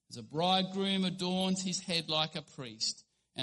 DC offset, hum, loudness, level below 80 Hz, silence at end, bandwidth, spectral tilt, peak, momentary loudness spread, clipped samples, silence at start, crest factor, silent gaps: under 0.1%; none; -33 LUFS; -72 dBFS; 0 s; 11.5 kHz; -4 dB/octave; -14 dBFS; 13 LU; under 0.1%; 0.1 s; 20 dB; none